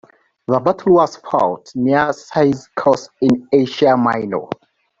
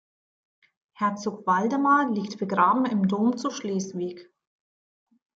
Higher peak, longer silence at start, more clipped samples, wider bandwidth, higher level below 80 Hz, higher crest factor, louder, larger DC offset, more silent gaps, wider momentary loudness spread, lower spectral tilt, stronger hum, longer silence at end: first, -2 dBFS vs -8 dBFS; second, 0.5 s vs 1 s; neither; about the same, 7.8 kHz vs 7.8 kHz; first, -56 dBFS vs -74 dBFS; about the same, 16 dB vs 20 dB; first, -16 LUFS vs -25 LUFS; neither; neither; about the same, 9 LU vs 9 LU; about the same, -6.5 dB/octave vs -6 dB/octave; neither; second, 0.45 s vs 1.15 s